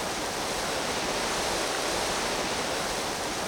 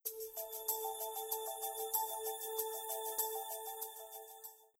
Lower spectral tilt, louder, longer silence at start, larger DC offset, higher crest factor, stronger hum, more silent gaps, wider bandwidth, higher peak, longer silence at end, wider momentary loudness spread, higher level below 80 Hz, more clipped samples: first, -2 dB/octave vs 2 dB/octave; first, -28 LUFS vs -40 LUFS; about the same, 0 s vs 0.05 s; neither; second, 14 dB vs 22 dB; neither; neither; about the same, over 20 kHz vs over 20 kHz; first, -16 dBFS vs -20 dBFS; second, 0 s vs 0.15 s; second, 2 LU vs 11 LU; first, -50 dBFS vs -84 dBFS; neither